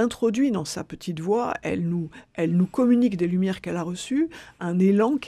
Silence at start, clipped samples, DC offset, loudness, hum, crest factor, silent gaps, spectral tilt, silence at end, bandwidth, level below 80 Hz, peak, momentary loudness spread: 0 s; under 0.1%; under 0.1%; -24 LUFS; none; 14 dB; none; -7 dB/octave; 0 s; 13 kHz; -58 dBFS; -10 dBFS; 11 LU